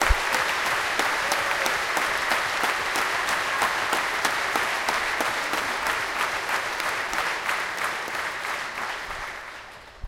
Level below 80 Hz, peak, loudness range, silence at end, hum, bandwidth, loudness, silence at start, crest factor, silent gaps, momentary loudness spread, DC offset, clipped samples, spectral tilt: -42 dBFS; -4 dBFS; 4 LU; 0 s; none; 17 kHz; -25 LUFS; 0 s; 22 dB; none; 7 LU; under 0.1%; under 0.1%; -1.5 dB/octave